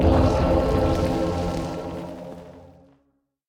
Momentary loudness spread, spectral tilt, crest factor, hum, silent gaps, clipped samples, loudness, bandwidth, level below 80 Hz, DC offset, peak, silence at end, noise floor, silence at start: 18 LU; -7.5 dB/octave; 18 dB; none; none; under 0.1%; -23 LUFS; 14.5 kHz; -32 dBFS; under 0.1%; -4 dBFS; 0.8 s; -69 dBFS; 0 s